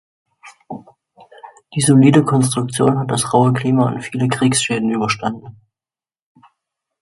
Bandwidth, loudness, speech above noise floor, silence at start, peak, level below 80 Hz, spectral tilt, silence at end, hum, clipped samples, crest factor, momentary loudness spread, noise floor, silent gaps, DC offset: 11.5 kHz; -16 LUFS; over 75 dB; 0.45 s; 0 dBFS; -54 dBFS; -5.5 dB/octave; 1.5 s; none; under 0.1%; 18 dB; 20 LU; under -90 dBFS; none; under 0.1%